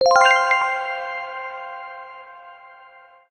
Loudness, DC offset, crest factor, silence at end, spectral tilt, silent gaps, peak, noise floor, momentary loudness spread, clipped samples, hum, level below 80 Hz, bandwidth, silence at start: -19 LUFS; under 0.1%; 18 dB; 0.75 s; 0.5 dB/octave; none; -4 dBFS; -48 dBFS; 25 LU; under 0.1%; none; -66 dBFS; 12 kHz; 0 s